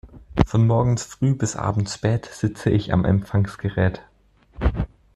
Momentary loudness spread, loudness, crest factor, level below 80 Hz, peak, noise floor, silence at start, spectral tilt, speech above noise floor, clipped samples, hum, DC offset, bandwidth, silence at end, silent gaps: 8 LU; -22 LUFS; 20 dB; -34 dBFS; -2 dBFS; -56 dBFS; 0.05 s; -6.5 dB/octave; 35 dB; under 0.1%; none; under 0.1%; 11.5 kHz; 0.3 s; none